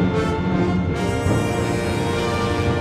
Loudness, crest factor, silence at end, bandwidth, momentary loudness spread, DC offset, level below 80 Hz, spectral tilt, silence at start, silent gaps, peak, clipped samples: -21 LUFS; 12 dB; 0 s; 15 kHz; 2 LU; under 0.1%; -34 dBFS; -6.5 dB/octave; 0 s; none; -8 dBFS; under 0.1%